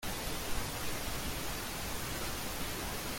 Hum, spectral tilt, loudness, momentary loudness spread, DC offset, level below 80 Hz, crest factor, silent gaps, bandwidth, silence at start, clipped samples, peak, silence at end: none; -3 dB/octave; -38 LUFS; 1 LU; under 0.1%; -46 dBFS; 16 dB; none; 17 kHz; 0 s; under 0.1%; -22 dBFS; 0 s